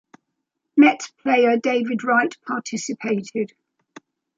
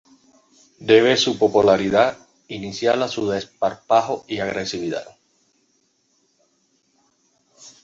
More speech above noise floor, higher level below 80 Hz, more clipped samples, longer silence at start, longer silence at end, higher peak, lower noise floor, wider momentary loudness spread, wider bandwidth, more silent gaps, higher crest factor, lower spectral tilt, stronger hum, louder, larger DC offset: first, 59 dB vs 46 dB; second, -74 dBFS vs -58 dBFS; neither; about the same, 0.75 s vs 0.8 s; first, 0.9 s vs 0.15 s; about the same, -4 dBFS vs -2 dBFS; first, -78 dBFS vs -65 dBFS; second, 12 LU vs 15 LU; about the same, 7.8 kHz vs 7.8 kHz; neither; about the same, 18 dB vs 20 dB; about the same, -4.5 dB/octave vs -4.5 dB/octave; neither; about the same, -20 LUFS vs -19 LUFS; neither